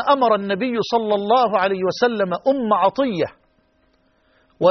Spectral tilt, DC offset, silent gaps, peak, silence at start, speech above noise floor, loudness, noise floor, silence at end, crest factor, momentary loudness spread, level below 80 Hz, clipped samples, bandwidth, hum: -3.5 dB/octave; under 0.1%; none; -4 dBFS; 0 s; 43 dB; -19 LUFS; -61 dBFS; 0 s; 16 dB; 5 LU; -62 dBFS; under 0.1%; 6.4 kHz; none